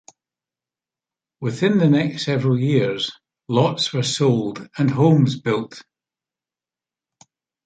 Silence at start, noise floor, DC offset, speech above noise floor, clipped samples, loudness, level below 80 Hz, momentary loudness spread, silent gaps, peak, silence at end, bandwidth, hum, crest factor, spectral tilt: 1.4 s; under -90 dBFS; under 0.1%; over 71 dB; under 0.1%; -20 LUFS; -62 dBFS; 11 LU; none; -4 dBFS; 1.85 s; 9.2 kHz; none; 18 dB; -6 dB/octave